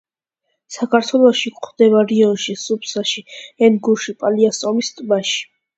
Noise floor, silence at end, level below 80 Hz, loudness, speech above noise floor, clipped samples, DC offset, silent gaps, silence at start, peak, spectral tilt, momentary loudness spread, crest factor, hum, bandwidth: -74 dBFS; 0.35 s; -68 dBFS; -17 LUFS; 58 dB; under 0.1%; under 0.1%; none; 0.7 s; 0 dBFS; -4 dB/octave; 10 LU; 16 dB; none; 8.2 kHz